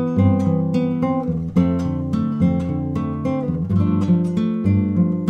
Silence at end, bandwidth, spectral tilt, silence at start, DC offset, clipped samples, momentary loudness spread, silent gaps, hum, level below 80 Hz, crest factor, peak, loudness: 0 s; 6.6 kHz; -10 dB/octave; 0 s; under 0.1%; under 0.1%; 5 LU; none; none; -42 dBFS; 14 dB; -4 dBFS; -20 LUFS